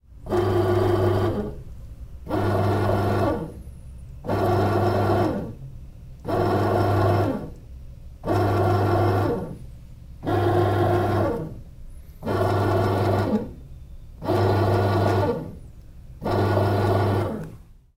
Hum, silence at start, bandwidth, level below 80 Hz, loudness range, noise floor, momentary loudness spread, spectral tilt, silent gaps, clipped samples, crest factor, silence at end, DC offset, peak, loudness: none; 0.1 s; 16 kHz; -42 dBFS; 2 LU; -44 dBFS; 21 LU; -8 dB/octave; none; under 0.1%; 14 dB; 0.25 s; under 0.1%; -8 dBFS; -23 LUFS